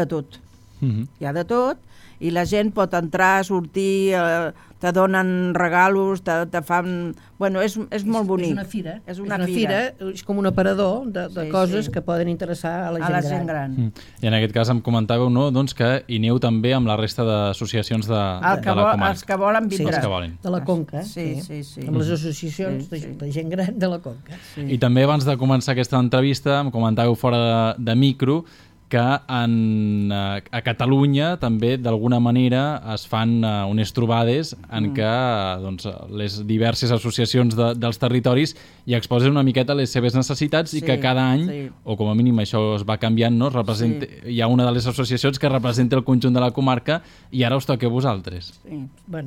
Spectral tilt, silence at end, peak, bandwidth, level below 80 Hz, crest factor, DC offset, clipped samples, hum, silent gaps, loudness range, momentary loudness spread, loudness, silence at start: -6.5 dB/octave; 0 s; -4 dBFS; 15.5 kHz; -50 dBFS; 16 dB; under 0.1%; under 0.1%; none; none; 4 LU; 10 LU; -21 LUFS; 0 s